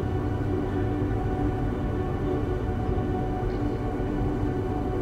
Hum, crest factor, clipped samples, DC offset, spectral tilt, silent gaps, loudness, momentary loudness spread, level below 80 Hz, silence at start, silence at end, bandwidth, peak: none; 14 dB; under 0.1%; under 0.1%; -9 dB/octave; none; -28 LUFS; 1 LU; -34 dBFS; 0 s; 0 s; 9.6 kHz; -14 dBFS